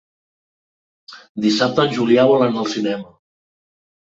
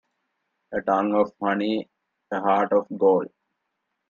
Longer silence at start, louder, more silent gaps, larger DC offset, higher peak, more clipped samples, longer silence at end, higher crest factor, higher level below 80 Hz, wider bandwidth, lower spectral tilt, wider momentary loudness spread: first, 1.1 s vs 0.7 s; first, -17 LUFS vs -23 LUFS; first, 1.29-1.35 s vs none; neither; first, -2 dBFS vs -8 dBFS; neither; first, 1.1 s vs 0.85 s; about the same, 18 dB vs 18 dB; first, -62 dBFS vs -70 dBFS; first, 8 kHz vs 6.8 kHz; second, -5.5 dB/octave vs -7.5 dB/octave; about the same, 11 LU vs 10 LU